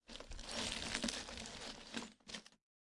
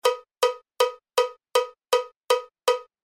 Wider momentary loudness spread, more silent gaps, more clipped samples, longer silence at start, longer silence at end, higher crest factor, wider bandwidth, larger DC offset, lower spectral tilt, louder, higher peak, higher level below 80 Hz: first, 11 LU vs 2 LU; second, none vs 2.16-2.20 s; neither; about the same, 0.1 s vs 0.05 s; first, 0.4 s vs 0.2 s; first, 30 dB vs 20 dB; second, 11.5 kHz vs 16 kHz; neither; first, -2 dB/octave vs 1.5 dB/octave; second, -45 LUFS vs -26 LUFS; second, -16 dBFS vs -6 dBFS; first, -60 dBFS vs -80 dBFS